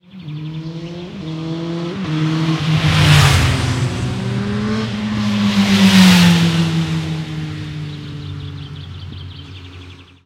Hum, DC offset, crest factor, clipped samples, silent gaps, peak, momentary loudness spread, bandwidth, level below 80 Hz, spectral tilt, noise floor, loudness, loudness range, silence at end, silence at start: none; under 0.1%; 16 dB; under 0.1%; none; 0 dBFS; 21 LU; 16 kHz; -36 dBFS; -5.5 dB/octave; -37 dBFS; -15 LUFS; 9 LU; 0.25 s; 0.15 s